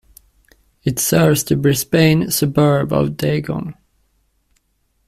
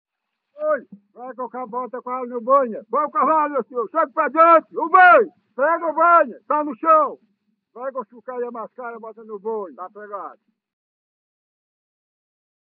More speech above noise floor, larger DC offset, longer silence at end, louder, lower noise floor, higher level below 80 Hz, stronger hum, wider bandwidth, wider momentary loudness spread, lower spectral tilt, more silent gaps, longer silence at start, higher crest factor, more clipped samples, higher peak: about the same, 49 dB vs 52 dB; neither; second, 1.35 s vs 2.4 s; about the same, -16 LUFS vs -18 LUFS; second, -65 dBFS vs -72 dBFS; first, -46 dBFS vs under -90 dBFS; neither; first, 16 kHz vs 4.6 kHz; second, 11 LU vs 20 LU; first, -5.5 dB/octave vs -2 dB/octave; neither; first, 0.85 s vs 0.6 s; about the same, 16 dB vs 20 dB; neither; about the same, -2 dBFS vs -2 dBFS